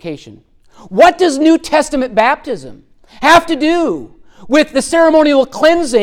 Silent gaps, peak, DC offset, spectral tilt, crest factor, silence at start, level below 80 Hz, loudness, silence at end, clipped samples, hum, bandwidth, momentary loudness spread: none; 0 dBFS; under 0.1%; -3.5 dB/octave; 12 dB; 0.05 s; -44 dBFS; -11 LUFS; 0 s; under 0.1%; none; 16 kHz; 13 LU